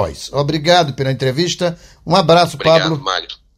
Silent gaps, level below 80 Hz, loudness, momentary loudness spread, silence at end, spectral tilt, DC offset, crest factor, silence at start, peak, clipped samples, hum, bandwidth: none; -44 dBFS; -15 LUFS; 9 LU; 0.25 s; -5 dB/octave; under 0.1%; 16 dB; 0 s; 0 dBFS; under 0.1%; none; 15 kHz